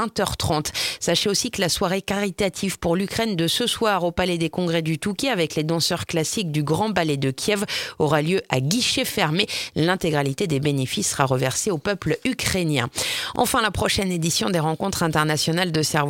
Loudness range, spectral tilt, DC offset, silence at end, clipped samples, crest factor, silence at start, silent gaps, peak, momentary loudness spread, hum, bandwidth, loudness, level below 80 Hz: 1 LU; -4 dB/octave; under 0.1%; 0 s; under 0.1%; 22 dB; 0 s; none; 0 dBFS; 4 LU; none; 17 kHz; -22 LUFS; -46 dBFS